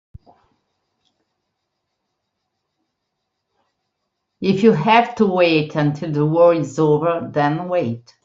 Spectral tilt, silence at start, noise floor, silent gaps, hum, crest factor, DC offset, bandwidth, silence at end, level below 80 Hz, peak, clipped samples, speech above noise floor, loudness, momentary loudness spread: -7 dB/octave; 4.4 s; -76 dBFS; none; none; 18 dB; under 0.1%; 7.6 kHz; 0.25 s; -60 dBFS; -2 dBFS; under 0.1%; 60 dB; -17 LUFS; 7 LU